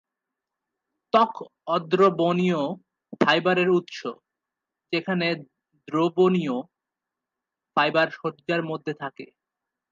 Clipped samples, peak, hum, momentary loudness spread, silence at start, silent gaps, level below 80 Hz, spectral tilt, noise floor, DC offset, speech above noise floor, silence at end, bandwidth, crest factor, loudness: under 0.1%; -4 dBFS; none; 14 LU; 1.15 s; none; -76 dBFS; -6.5 dB/octave; -87 dBFS; under 0.1%; 63 dB; 0.65 s; 7.4 kHz; 22 dB; -24 LUFS